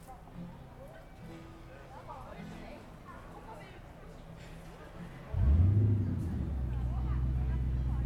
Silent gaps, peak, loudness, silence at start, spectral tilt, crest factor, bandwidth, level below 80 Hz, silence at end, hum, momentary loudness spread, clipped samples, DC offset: none; -18 dBFS; -32 LUFS; 0 s; -9 dB/octave; 16 dB; 8 kHz; -38 dBFS; 0 s; none; 22 LU; under 0.1%; under 0.1%